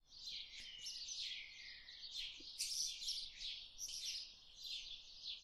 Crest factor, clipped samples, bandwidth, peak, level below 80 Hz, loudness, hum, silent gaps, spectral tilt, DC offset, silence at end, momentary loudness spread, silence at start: 22 dB; under 0.1%; 15.5 kHz; -28 dBFS; -70 dBFS; -46 LUFS; none; none; 3 dB/octave; under 0.1%; 0 s; 11 LU; 0.05 s